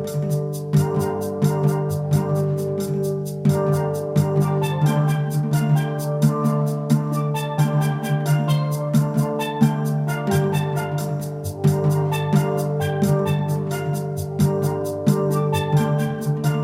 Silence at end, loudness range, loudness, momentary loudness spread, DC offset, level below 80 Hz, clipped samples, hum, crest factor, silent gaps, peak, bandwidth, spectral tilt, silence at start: 0 s; 1 LU; -21 LUFS; 4 LU; under 0.1%; -56 dBFS; under 0.1%; none; 16 dB; none; -4 dBFS; 16 kHz; -7.5 dB/octave; 0 s